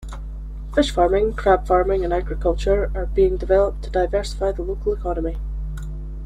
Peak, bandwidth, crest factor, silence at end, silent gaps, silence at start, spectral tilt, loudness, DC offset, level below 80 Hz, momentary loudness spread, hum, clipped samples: -4 dBFS; 11 kHz; 16 dB; 0 s; none; 0 s; -6.5 dB/octave; -21 LUFS; under 0.1%; -28 dBFS; 14 LU; none; under 0.1%